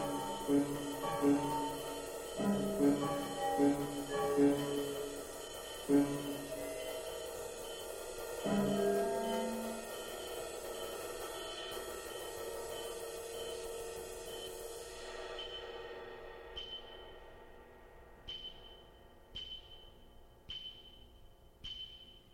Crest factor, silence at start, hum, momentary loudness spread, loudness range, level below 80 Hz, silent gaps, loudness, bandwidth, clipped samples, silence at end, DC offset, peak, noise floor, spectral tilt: 20 dB; 0 s; none; 18 LU; 15 LU; -60 dBFS; none; -39 LUFS; 16 kHz; under 0.1%; 0 s; under 0.1%; -18 dBFS; -59 dBFS; -4.5 dB/octave